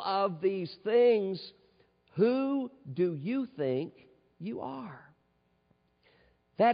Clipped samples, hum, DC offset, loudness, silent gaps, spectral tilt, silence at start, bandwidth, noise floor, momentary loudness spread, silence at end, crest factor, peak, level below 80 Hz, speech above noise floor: under 0.1%; none; under 0.1%; -31 LUFS; none; -5.5 dB/octave; 0 s; 5 kHz; -72 dBFS; 18 LU; 0 s; 18 dB; -14 dBFS; -78 dBFS; 42 dB